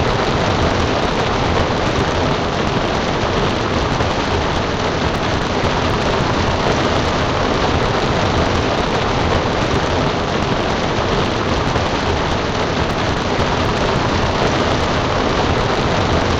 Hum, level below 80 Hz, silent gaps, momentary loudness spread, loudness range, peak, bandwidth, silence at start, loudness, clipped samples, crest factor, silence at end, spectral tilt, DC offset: none; -28 dBFS; none; 2 LU; 1 LU; -4 dBFS; 9.8 kHz; 0 s; -17 LUFS; under 0.1%; 14 dB; 0 s; -5 dB/octave; 0.2%